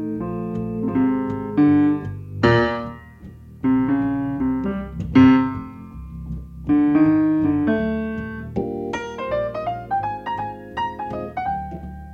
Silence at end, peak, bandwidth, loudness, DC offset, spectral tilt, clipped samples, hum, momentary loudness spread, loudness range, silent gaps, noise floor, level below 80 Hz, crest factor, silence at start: 0 s; -4 dBFS; 6.8 kHz; -21 LUFS; under 0.1%; -8.5 dB/octave; under 0.1%; none; 17 LU; 7 LU; none; -41 dBFS; -42 dBFS; 18 dB; 0 s